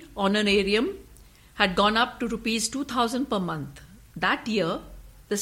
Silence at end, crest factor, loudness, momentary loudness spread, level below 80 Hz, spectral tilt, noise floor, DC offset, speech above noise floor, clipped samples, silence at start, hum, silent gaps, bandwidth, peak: 0 s; 22 dB; -25 LUFS; 13 LU; -50 dBFS; -3.5 dB/octave; -51 dBFS; under 0.1%; 26 dB; under 0.1%; 0 s; none; none; 16.5 kHz; -4 dBFS